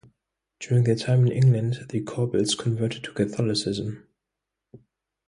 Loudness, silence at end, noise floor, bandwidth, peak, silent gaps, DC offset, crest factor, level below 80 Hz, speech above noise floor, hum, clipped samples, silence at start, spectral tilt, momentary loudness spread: -24 LUFS; 0.5 s; -85 dBFS; 11 kHz; -10 dBFS; none; under 0.1%; 16 dB; -58 dBFS; 62 dB; none; under 0.1%; 0.6 s; -6 dB/octave; 10 LU